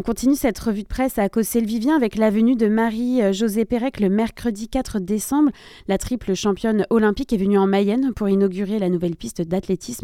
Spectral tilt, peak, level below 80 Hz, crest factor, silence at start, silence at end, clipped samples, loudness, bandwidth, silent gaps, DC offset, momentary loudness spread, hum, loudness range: -6 dB/octave; -4 dBFS; -42 dBFS; 16 dB; 0 s; 0.05 s; under 0.1%; -20 LUFS; 16.5 kHz; none; under 0.1%; 7 LU; none; 2 LU